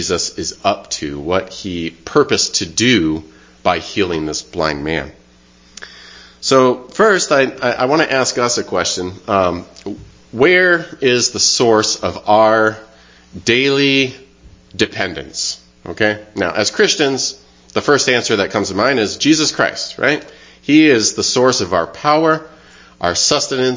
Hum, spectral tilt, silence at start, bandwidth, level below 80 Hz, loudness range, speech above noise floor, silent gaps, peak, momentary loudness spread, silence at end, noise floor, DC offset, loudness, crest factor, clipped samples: none; -3 dB/octave; 0 s; 7.8 kHz; -44 dBFS; 4 LU; 33 dB; none; 0 dBFS; 11 LU; 0 s; -48 dBFS; under 0.1%; -15 LUFS; 16 dB; under 0.1%